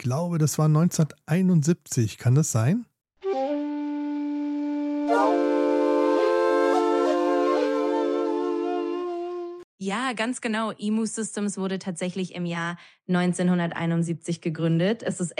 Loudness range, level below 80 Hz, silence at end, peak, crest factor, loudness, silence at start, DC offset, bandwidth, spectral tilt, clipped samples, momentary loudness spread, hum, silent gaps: 6 LU; -72 dBFS; 0.05 s; -10 dBFS; 14 dB; -25 LUFS; 0 s; under 0.1%; 14.5 kHz; -6 dB/octave; under 0.1%; 9 LU; none; 9.64-9.78 s